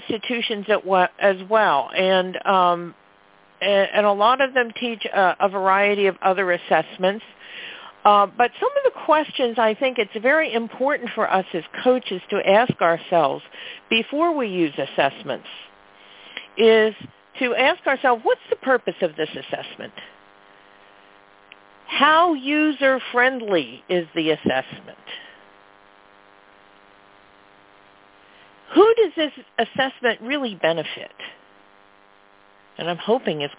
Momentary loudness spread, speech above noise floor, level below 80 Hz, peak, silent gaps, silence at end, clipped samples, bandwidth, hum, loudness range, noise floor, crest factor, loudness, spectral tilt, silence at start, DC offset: 17 LU; 34 dB; -68 dBFS; -2 dBFS; none; 0.05 s; under 0.1%; 4 kHz; none; 7 LU; -54 dBFS; 20 dB; -20 LUFS; -8 dB/octave; 0 s; under 0.1%